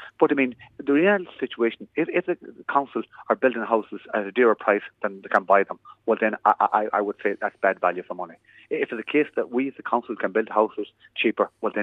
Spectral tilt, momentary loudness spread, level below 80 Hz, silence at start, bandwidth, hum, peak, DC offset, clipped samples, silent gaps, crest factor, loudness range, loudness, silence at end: -7.5 dB/octave; 12 LU; -76 dBFS; 0 s; 4.8 kHz; none; -4 dBFS; under 0.1%; under 0.1%; none; 20 dB; 4 LU; -24 LUFS; 0 s